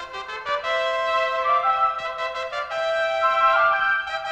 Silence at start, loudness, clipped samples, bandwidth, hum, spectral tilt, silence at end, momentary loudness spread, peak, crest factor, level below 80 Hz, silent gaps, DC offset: 0 s; -22 LUFS; under 0.1%; 9 kHz; none; -1 dB/octave; 0 s; 10 LU; -8 dBFS; 14 dB; -58 dBFS; none; under 0.1%